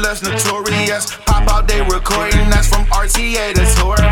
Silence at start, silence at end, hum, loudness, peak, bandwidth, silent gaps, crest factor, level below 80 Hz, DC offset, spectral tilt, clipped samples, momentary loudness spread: 0 s; 0 s; none; -15 LUFS; 0 dBFS; 17 kHz; none; 12 dB; -14 dBFS; under 0.1%; -3.5 dB/octave; under 0.1%; 4 LU